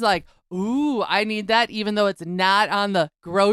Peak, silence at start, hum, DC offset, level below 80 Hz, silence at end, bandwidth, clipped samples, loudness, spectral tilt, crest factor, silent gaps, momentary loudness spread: -6 dBFS; 0 s; none; under 0.1%; -58 dBFS; 0 s; 14 kHz; under 0.1%; -21 LUFS; -5 dB/octave; 16 dB; none; 6 LU